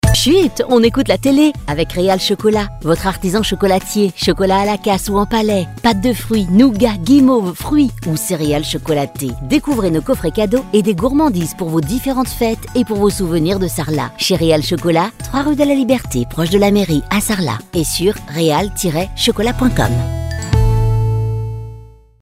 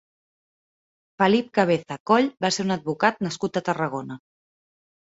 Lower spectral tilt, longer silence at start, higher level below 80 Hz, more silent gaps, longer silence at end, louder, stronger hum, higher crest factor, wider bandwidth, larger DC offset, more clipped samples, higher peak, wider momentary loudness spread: about the same, -5.5 dB/octave vs -5 dB/octave; second, 0.05 s vs 1.2 s; first, -28 dBFS vs -66 dBFS; second, none vs 2.00-2.06 s; second, 0.4 s vs 0.85 s; first, -15 LUFS vs -23 LUFS; neither; second, 14 dB vs 22 dB; first, 16 kHz vs 8 kHz; neither; neither; about the same, 0 dBFS vs -2 dBFS; about the same, 6 LU vs 8 LU